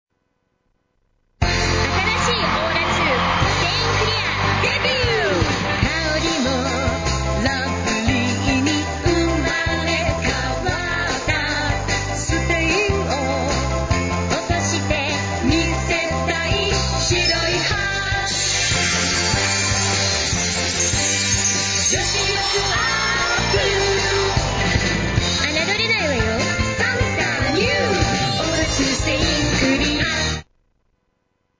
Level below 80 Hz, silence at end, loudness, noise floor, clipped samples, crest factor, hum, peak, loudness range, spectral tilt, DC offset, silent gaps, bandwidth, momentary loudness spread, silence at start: -30 dBFS; 1.15 s; -18 LUFS; -69 dBFS; under 0.1%; 16 dB; none; -4 dBFS; 3 LU; -3.5 dB/octave; under 0.1%; none; 8 kHz; 4 LU; 1.4 s